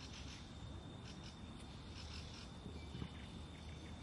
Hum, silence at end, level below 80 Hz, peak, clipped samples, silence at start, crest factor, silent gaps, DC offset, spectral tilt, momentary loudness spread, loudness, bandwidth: none; 0 s; -58 dBFS; -32 dBFS; under 0.1%; 0 s; 18 dB; none; under 0.1%; -5 dB/octave; 3 LU; -52 LUFS; 11.5 kHz